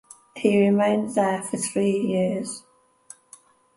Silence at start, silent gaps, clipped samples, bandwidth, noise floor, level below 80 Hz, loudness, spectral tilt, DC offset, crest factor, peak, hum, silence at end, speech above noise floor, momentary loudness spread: 0.35 s; none; under 0.1%; 11.5 kHz; -53 dBFS; -68 dBFS; -23 LUFS; -5.5 dB/octave; under 0.1%; 18 dB; -6 dBFS; none; 1.15 s; 31 dB; 13 LU